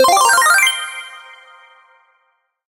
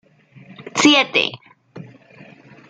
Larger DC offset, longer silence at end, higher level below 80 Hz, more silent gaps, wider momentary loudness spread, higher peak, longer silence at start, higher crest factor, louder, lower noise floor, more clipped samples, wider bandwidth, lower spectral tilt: neither; first, 1.45 s vs 0.9 s; first, -60 dBFS vs -66 dBFS; neither; first, 20 LU vs 15 LU; about the same, 0 dBFS vs 0 dBFS; second, 0 s vs 0.65 s; second, 16 dB vs 22 dB; first, -11 LUFS vs -15 LUFS; first, -65 dBFS vs -46 dBFS; neither; first, 17 kHz vs 9.2 kHz; second, 1.5 dB/octave vs -2.5 dB/octave